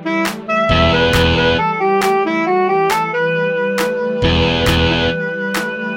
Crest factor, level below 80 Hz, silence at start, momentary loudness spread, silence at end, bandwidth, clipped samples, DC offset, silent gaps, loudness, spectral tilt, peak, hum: 14 dB; -30 dBFS; 0 s; 6 LU; 0 s; 17 kHz; under 0.1%; under 0.1%; none; -15 LUFS; -5 dB/octave; 0 dBFS; none